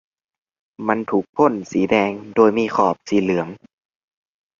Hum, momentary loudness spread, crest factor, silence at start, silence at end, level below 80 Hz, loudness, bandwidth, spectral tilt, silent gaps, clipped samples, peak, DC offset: none; 7 LU; 18 dB; 0.8 s; 1.05 s; -58 dBFS; -19 LUFS; 7.4 kHz; -6.5 dB/octave; 1.29-1.33 s; under 0.1%; -2 dBFS; under 0.1%